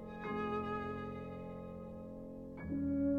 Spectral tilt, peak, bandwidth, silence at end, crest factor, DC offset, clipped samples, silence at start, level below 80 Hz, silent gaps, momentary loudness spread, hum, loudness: -9 dB/octave; -26 dBFS; 5.4 kHz; 0 s; 14 dB; under 0.1%; under 0.1%; 0 s; -58 dBFS; none; 11 LU; none; -42 LUFS